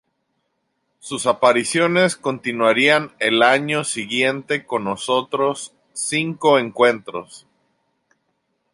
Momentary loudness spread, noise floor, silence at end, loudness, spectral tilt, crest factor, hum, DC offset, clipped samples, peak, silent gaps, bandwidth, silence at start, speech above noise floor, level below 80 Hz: 12 LU; -72 dBFS; 1.35 s; -18 LUFS; -3.5 dB/octave; 18 dB; none; under 0.1%; under 0.1%; -2 dBFS; none; 11.5 kHz; 1.05 s; 53 dB; -68 dBFS